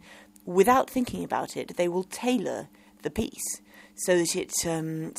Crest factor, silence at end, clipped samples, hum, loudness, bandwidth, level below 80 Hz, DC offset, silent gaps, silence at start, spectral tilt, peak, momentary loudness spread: 20 dB; 0 s; under 0.1%; none; -27 LUFS; 16 kHz; -56 dBFS; under 0.1%; none; 0.05 s; -4 dB/octave; -8 dBFS; 14 LU